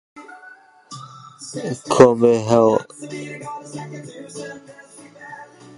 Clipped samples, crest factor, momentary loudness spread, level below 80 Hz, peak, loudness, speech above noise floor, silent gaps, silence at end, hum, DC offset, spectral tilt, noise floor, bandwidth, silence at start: under 0.1%; 20 dB; 26 LU; -58 dBFS; 0 dBFS; -16 LUFS; 27 dB; none; 0.35 s; none; under 0.1%; -6 dB/octave; -46 dBFS; 11.5 kHz; 0.15 s